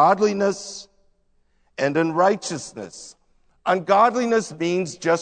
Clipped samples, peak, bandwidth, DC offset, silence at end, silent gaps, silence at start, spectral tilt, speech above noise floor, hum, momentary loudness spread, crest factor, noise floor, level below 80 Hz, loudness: under 0.1%; -4 dBFS; 9.4 kHz; under 0.1%; 0 s; none; 0 s; -4.5 dB/octave; 42 dB; none; 19 LU; 18 dB; -63 dBFS; -64 dBFS; -21 LUFS